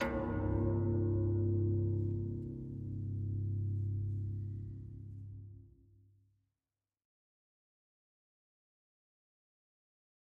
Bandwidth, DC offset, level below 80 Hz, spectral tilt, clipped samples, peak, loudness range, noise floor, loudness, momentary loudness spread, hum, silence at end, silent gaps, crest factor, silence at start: 3.7 kHz; under 0.1%; -52 dBFS; -10.5 dB/octave; under 0.1%; -22 dBFS; 19 LU; under -90 dBFS; -37 LUFS; 16 LU; none; 4.7 s; none; 16 dB; 0 s